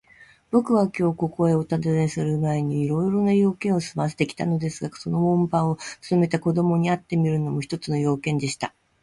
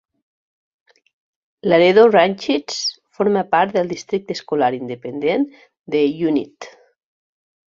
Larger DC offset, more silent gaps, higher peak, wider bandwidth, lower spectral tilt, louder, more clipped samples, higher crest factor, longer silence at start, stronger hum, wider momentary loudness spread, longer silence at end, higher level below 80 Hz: neither; second, none vs 5.79-5.84 s; second, -6 dBFS vs -2 dBFS; first, 11.5 kHz vs 7.6 kHz; first, -7 dB/octave vs -5 dB/octave; second, -23 LUFS vs -18 LUFS; neither; about the same, 16 dB vs 18 dB; second, 0.2 s vs 1.65 s; neither; second, 7 LU vs 14 LU; second, 0.35 s vs 1.05 s; first, -56 dBFS vs -64 dBFS